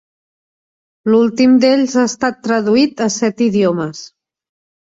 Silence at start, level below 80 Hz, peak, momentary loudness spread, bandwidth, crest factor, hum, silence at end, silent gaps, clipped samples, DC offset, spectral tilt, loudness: 1.05 s; -60 dBFS; 0 dBFS; 10 LU; 7.8 kHz; 14 dB; none; 0.8 s; none; under 0.1%; under 0.1%; -5 dB/octave; -14 LUFS